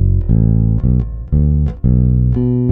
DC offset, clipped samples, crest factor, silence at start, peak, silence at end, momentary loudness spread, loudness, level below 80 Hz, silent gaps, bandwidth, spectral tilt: under 0.1%; under 0.1%; 10 dB; 0 s; -2 dBFS; 0 s; 3 LU; -14 LUFS; -18 dBFS; none; 1.8 kHz; -13.5 dB/octave